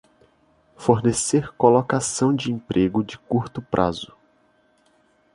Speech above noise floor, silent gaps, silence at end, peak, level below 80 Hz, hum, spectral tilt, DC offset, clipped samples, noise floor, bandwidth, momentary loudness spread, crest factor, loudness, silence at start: 41 dB; none; 1.3 s; -2 dBFS; -52 dBFS; none; -5.5 dB/octave; under 0.1%; under 0.1%; -61 dBFS; 11.5 kHz; 8 LU; 20 dB; -21 LUFS; 0.8 s